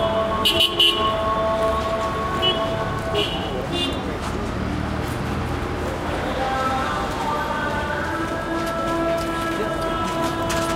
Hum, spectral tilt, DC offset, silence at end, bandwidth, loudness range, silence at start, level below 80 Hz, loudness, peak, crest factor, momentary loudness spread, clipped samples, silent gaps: none; -4.5 dB/octave; under 0.1%; 0 s; 16.5 kHz; 5 LU; 0 s; -36 dBFS; -22 LUFS; -6 dBFS; 16 dB; 9 LU; under 0.1%; none